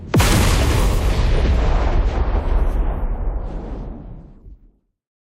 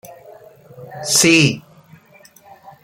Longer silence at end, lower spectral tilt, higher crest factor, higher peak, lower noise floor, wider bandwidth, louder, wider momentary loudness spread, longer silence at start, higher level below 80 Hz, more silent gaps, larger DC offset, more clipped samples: second, 0.7 s vs 1.25 s; first, -5 dB/octave vs -3 dB/octave; about the same, 16 dB vs 20 dB; about the same, -2 dBFS vs 0 dBFS; first, -54 dBFS vs -48 dBFS; about the same, 16 kHz vs 16.5 kHz; second, -20 LUFS vs -13 LUFS; second, 16 LU vs 21 LU; second, 0 s vs 0.3 s; first, -20 dBFS vs -58 dBFS; neither; neither; neither